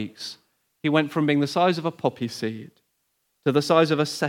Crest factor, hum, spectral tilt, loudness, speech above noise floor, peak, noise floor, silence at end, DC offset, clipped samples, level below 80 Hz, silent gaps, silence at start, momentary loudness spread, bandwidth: 20 dB; none; -5.5 dB/octave; -23 LUFS; 50 dB; -4 dBFS; -73 dBFS; 0 s; under 0.1%; under 0.1%; -76 dBFS; none; 0 s; 14 LU; 16.5 kHz